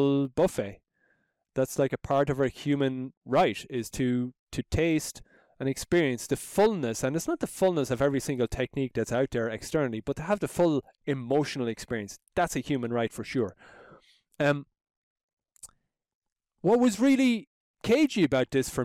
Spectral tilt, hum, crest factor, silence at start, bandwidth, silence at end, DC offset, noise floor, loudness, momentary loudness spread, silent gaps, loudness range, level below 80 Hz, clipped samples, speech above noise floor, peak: -5.5 dB/octave; none; 14 dB; 0 s; 16 kHz; 0 s; under 0.1%; -73 dBFS; -28 LUFS; 10 LU; 3.17-3.21 s, 4.39-4.47 s, 14.97-15.16 s, 15.23-15.37 s, 16.15-16.22 s, 17.47-17.74 s; 4 LU; -52 dBFS; under 0.1%; 45 dB; -14 dBFS